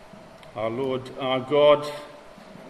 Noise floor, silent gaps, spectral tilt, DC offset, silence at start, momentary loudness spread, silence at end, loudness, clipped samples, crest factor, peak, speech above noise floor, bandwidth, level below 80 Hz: -46 dBFS; none; -6 dB/octave; under 0.1%; 0 s; 21 LU; 0 s; -23 LUFS; under 0.1%; 20 dB; -6 dBFS; 23 dB; 12.5 kHz; -62 dBFS